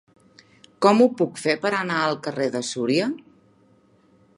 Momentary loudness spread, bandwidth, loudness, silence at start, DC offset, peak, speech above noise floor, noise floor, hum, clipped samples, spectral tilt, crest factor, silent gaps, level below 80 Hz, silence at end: 9 LU; 11.5 kHz; -22 LUFS; 0.8 s; under 0.1%; -2 dBFS; 37 dB; -58 dBFS; none; under 0.1%; -5 dB/octave; 22 dB; none; -72 dBFS; 1.2 s